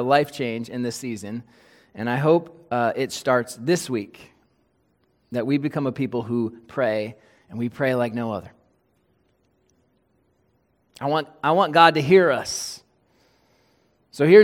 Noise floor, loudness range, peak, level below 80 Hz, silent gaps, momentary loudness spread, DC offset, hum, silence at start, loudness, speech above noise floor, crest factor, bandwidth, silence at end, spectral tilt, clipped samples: -66 dBFS; 9 LU; 0 dBFS; -66 dBFS; none; 16 LU; under 0.1%; none; 0 s; -22 LUFS; 45 dB; 22 dB; 16.5 kHz; 0 s; -5.5 dB/octave; under 0.1%